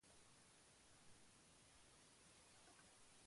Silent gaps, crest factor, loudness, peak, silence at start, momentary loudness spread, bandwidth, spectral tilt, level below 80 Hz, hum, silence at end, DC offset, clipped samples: none; 14 dB; -68 LUFS; -56 dBFS; 0 s; 2 LU; 11.5 kHz; -2 dB/octave; -84 dBFS; none; 0 s; under 0.1%; under 0.1%